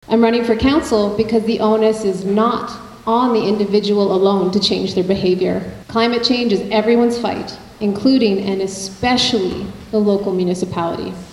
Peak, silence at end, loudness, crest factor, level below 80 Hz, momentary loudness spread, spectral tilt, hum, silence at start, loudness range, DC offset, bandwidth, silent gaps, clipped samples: -2 dBFS; 0 s; -16 LUFS; 16 dB; -44 dBFS; 8 LU; -5.5 dB/octave; none; 0.1 s; 1 LU; under 0.1%; 12.5 kHz; none; under 0.1%